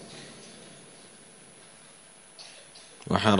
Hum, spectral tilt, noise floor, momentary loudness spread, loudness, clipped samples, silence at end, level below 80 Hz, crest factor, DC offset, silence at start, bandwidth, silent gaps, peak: none; -5 dB/octave; -53 dBFS; 13 LU; -36 LUFS; under 0.1%; 0 s; -64 dBFS; 28 dB; under 0.1%; 0 s; 10.5 kHz; none; -4 dBFS